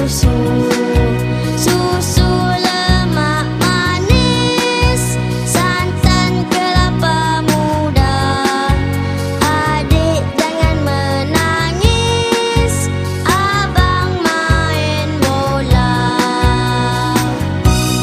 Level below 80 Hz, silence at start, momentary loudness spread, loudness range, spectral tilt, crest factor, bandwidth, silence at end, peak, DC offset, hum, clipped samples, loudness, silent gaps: -22 dBFS; 0 s; 3 LU; 1 LU; -5 dB/octave; 14 dB; 15.5 kHz; 0 s; 0 dBFS; under 0.1%; none; under 0.1%; -14 LUFS; none